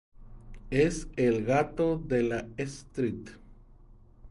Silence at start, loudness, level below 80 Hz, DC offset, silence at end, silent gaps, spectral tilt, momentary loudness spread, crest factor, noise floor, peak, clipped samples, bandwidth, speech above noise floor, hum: 0.2 s; -29 LUFS; -48 dBFS; under 0.1%; 0 s; none; -6.5 dB/octave; 11 LU; 18 dB; -54 dBFS; -12 dBFS; under 0.1%; 11.5 kHz; 25 dB; none